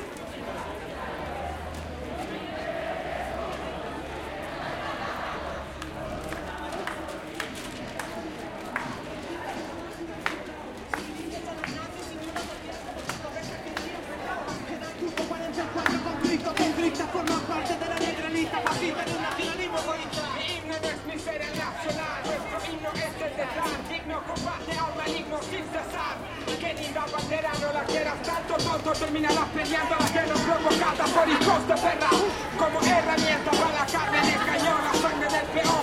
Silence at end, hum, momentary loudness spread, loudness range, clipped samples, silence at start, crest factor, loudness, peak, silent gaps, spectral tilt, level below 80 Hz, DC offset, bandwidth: 0 s; none; 13 LU; 11 LU; under 0.1%; 0 s; 22 dB; -28 LUFS; -6 dBFS; none; -3.5 dB/octave; -50 dBFS; under 0.1%; 16.5 kHz